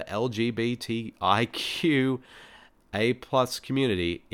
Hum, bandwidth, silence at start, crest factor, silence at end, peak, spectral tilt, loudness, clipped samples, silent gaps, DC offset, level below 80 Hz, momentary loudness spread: none; 18 kHz; 0 s; 20 dB; 0.15 s; -8 dBFS; -5.5 dB/octave; -27 LUFS; under 0.1%; none; under 0.1%; -58 dBFS; 6 LU